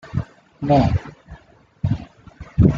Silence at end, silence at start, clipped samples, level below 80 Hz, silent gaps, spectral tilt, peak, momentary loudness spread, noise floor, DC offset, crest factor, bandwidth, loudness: 0 s; 0.05 s; under 0.1%; -34 dBFS; none; -9.5 dB/octave; -2 dBFS; 23 LU; -49 dBFS; under 0.1%; 18 dB; 7.4 kHz; -21 LUFS